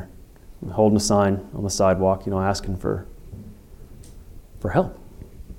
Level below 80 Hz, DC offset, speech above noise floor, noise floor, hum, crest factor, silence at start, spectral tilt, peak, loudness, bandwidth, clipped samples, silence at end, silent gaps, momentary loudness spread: -42 dBFS; under 0.1%; 23 dB; -44 dBFS; none; 18 dB; 0 s; -5.5 dB/octave; -6 dBFS; -22 LUFS; 16.5 kHz; under 0.1%; 0 s; none; 23 LU